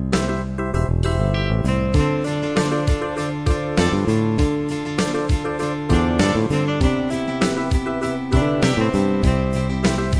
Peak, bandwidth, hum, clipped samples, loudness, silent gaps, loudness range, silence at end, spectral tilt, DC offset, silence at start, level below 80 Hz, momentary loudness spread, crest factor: -4 dBFS; 11 kHz; none; under 0.1%; -20 LUFS; none; 1 LU; 0 s; -6 dB/octave; 0.2%; 0 s; -28 dBFS; 5 LU; 16 dB